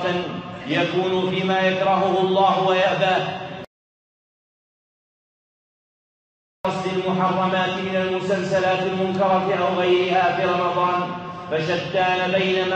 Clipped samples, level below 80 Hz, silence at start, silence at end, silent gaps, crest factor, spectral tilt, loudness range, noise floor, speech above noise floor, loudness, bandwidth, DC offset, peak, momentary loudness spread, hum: under 0.1%; -62 dBFS; 0 s; 0 s; 3.67-6.64 s; 16 dB; -6 dB/octave; 9 LU; under -90 dBFS; over 70 dB; -21 LUFS; 8.4 kHz; under 0.1%; -6 dBFS; 9 LU; none